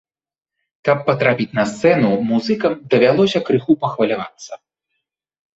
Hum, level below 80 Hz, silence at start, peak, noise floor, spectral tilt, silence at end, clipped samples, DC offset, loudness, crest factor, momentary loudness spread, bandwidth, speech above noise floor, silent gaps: none; -58 dBFS; 0.85 s; 0 dBFS; under -90 dBFS; -6.5 dB/octave; 1 s; under 0.1%; under 0.1%; -17 LUFS; 18 dB; 10 LU; 8 kHz; over 74 dB; none